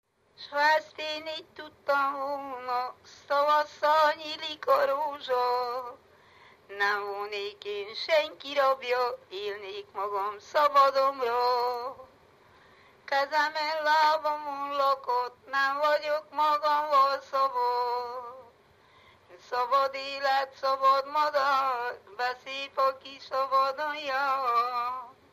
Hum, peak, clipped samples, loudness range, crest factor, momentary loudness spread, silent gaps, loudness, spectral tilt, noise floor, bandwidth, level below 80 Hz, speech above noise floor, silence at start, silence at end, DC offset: none; -12 dBFS; under 0.1%; 3 LU; 18 dB; 12 LU; none; -28 LUFS; -2 dB/octave; -60 dBFS; 15 kHz; -78 dBFS; 32 dB; 0.4 s; 0.2 s; under 0.1%